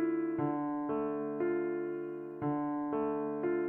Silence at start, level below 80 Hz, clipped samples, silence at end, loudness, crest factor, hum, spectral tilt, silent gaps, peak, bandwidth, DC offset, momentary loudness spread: 0 s; -72 dBFS; under 0.1%; 0 s; -35 LUFS; 12 dB; none; -11 dB/octave; none; -22 dBFS; 3.2 kHz; under 0.1%; 5 LU